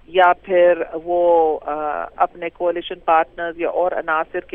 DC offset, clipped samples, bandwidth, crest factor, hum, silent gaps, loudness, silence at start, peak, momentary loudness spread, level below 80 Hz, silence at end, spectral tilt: under 0.1%; under 0.1%; 3.8 kHz; 16 dB; none; none; -19 LUFS; 0.1 s; -2 dBFS; 9 LU; -50 dBFS; 0.15 s; -7 dB/octave